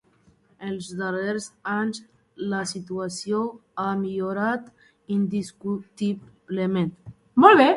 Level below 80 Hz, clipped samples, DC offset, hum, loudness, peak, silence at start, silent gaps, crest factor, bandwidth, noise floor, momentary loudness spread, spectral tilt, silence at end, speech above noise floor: -64 dBFS; under 0.1%; under 0.1%; none; -25 LUFS; 0 dBFS; 0.6 s; none; 24 dB; 11.5 kHz; -60 dBFS; 8 LU; -5.5 dB/octave; 0 s; 37 dB